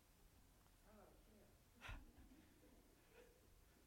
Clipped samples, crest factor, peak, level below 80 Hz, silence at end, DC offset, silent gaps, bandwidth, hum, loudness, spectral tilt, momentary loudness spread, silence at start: under 0.1%; 22 dB; -44 dBFS; -70 dBFS; 0 s; under 0.1%; none; 16.5 kHz; none; -64 LUFS; -4.5 dB/octave; 10 LU; 0 s